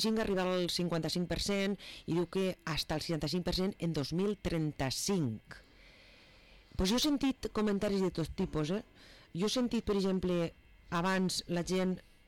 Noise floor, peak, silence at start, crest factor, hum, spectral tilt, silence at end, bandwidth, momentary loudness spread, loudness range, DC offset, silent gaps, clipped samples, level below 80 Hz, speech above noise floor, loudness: -59 dBFS; -24 dBFS; 0 s; 10 dB; none; -5 dB/octave; 0.2 s; 17 kHz; 5 LU; 2 LU; under 0.1%; none; under 0.1%; -52 dBFS; 26 dB; -34 LUFS